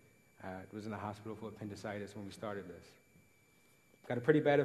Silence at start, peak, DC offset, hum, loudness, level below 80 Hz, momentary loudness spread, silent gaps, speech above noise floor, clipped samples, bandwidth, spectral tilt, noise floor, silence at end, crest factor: 0.4 s; -14 dBFS; under 0.1%; none; -39 LUFS; -76 dBFS; 20 LU; none; 32 dB; under 0.1%; 13 kHz; -7 dB/octave; -69 dBFS; 0 s; 24 dB